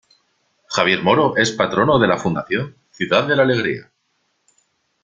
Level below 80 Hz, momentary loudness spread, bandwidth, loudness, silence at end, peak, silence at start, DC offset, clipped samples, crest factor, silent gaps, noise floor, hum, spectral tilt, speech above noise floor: -54 dBFS; 10 LU; 9.2 kHz; -17 LUFS; 1.2 s; -2 dBFS; 0.7 s; under 0.1%; under 0.1%; 18 dB; none; -68 dBFS; none; -5 dB/octave; 51 dB